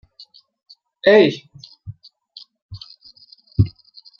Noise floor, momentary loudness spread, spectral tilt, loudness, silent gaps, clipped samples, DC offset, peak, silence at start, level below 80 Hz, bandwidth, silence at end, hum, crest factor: -49 dBFS; 27 LU; -7.5 dB/octave; -17 LUFS; 2.62-2.69 s; under 0.1%; under 0.1%; -2 dBFS; 1.05 s; -46 dBFS; 6.8 kHz; 0.5 s; none; 20 dB